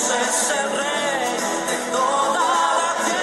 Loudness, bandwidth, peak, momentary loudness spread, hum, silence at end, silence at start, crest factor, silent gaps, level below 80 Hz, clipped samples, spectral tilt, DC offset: -20 LUFS; 14 kHz; -8 dBFS; 4 LU; none; 0 s; 0 s; 12 dB; none; -60 dBFS; under 0.1%; -1 dB/octave; under 0.1%